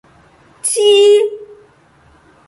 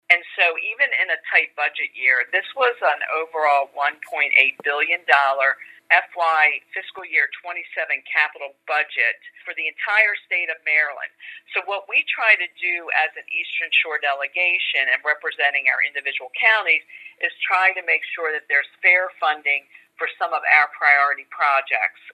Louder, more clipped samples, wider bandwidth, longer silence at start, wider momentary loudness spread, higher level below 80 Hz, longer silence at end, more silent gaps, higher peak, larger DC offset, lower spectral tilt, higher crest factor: first, -12 LUFS vs -19 LUFS; neither; about the same, 11.5 kHz vs 12.5 kHz; first, 0.65 s vs 0.1 s; first, 13 LU vs 10 LU; first, -60 dBFS vs -90 dBFS; first, 1.05 s vs 0 s; neither; about the same, -2 dBFS vs 0 dBFS; neither; about the same, -0.5 dB/octave vs -0.5 dB/octave; second, 14 dB vs 22 dB